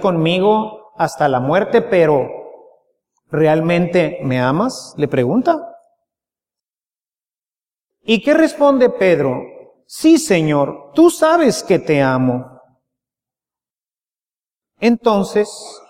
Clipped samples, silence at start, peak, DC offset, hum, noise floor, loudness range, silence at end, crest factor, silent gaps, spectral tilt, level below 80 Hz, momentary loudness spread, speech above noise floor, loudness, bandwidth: under 0.1%; 0 s; 0 dBFS; under 0.1%; none; under -90 dBFS; 7 LU; 0.1 s; 16 dB; none; -6 dB/octave; -56 dBFS; 9 LU; over 76 dB; -15 LUFS; 15.5 kHz